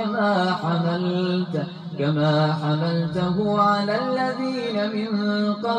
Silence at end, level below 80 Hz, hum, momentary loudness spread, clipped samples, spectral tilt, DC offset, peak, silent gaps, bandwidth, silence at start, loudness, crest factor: 0 s; -60 dBFS; none; 5 LU; under 0.1%; -7.5 dB/octave; under 0.1%; -8 dBFS; none; 9.4 kHz; 0 s; -23 LUFS; 14 dB